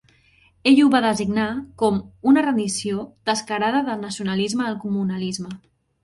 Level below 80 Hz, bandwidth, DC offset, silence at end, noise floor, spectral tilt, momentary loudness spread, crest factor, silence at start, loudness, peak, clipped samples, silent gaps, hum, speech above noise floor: -56 dBFS; 11.5 kHz; under 0.1%; 0.45 s; -57 dBFS; -4.5 dB/octave; 11 LU; 16 dB; 0.65 s; -21 LUFS; -4 dBFS; under 0.1%; none; none; 37 dB